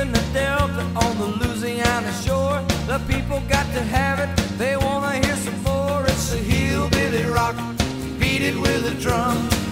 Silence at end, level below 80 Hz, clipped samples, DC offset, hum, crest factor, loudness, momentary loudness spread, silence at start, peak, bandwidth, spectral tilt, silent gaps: 0 s; -32 dBFS; under 0.1%; under 0.1%; none; 20 dB; -21 LUFS; 4 LU; 0 s; -2 dBFS; 16 kHz; -5 dB/octave; none